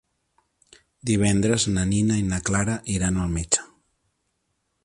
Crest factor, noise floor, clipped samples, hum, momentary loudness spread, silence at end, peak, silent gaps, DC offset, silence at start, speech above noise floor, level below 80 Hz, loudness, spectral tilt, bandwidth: 20 dB; -74 dBFS; under 0.1%; none; 5 LU; 1.2 s; -4 dBFS; none; under 0.1%; 1.05 s; 52 dB; -40 dBFS; -23 LUFS; -4.5 dB/octave; 11.5 kHz